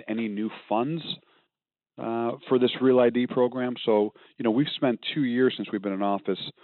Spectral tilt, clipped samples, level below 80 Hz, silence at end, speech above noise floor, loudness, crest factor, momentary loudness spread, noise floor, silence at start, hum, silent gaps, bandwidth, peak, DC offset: -4.5 dB/octave; under 0.1%; -80 dBFS; 0.1 s; over 65 dB; -26 LUFS; 14 dB; 10 LU; under -90 dBFS; 0.05 s; none; none; 4.4 kHz; -12 dBFS; under 0.1%